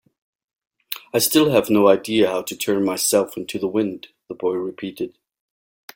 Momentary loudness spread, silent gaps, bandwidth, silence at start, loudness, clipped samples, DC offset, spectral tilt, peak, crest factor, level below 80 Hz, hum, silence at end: 16 LU; none; 17 kHz; 0.9 s; -20 LUFS; under 0.1%; under 0.1%; -4 dB/octave; -2 dBFS; 20 dB; -62 dBFS; none; 0.85 s